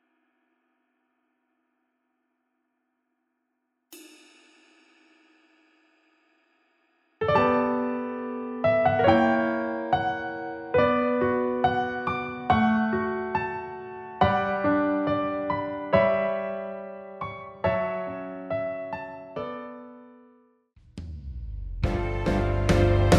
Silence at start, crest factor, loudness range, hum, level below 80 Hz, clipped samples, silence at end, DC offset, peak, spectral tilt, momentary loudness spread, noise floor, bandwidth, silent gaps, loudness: 3.9 s; 22 dB; 10 LU; none; -40 dBFS; under 0.1%; 0 s; under 0.1%; -6 dBFS; -7 dB/octave; 17 LU; -78 dBFS; 13 kHz; none; -26 LUFS